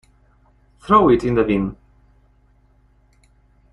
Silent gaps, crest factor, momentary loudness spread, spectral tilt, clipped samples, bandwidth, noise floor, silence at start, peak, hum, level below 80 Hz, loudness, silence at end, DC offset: none; 20 dB; 14 LU; -8 dB/octave; under 0.1%; 11 kHz; -56 dBFS; 0.85 s; -2 dBFS; 50 Hz at -45 dBFS; -44 dBFS; -17 LUFS; 2 s; under 0.1%